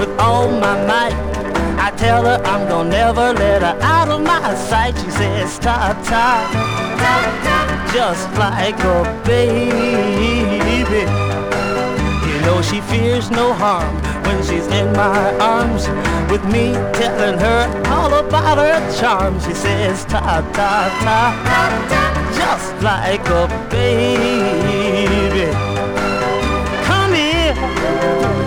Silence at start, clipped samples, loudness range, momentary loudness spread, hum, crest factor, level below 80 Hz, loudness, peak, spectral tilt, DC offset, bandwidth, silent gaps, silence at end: 0 s; under 0.1%; 1 LU; 4 LU; none; 14 dB; -28 dBFS; -15 LUFS; -2 dBFS; -5.5 dB/octave; under 0.1%; 18.5 kHz; none; 0 s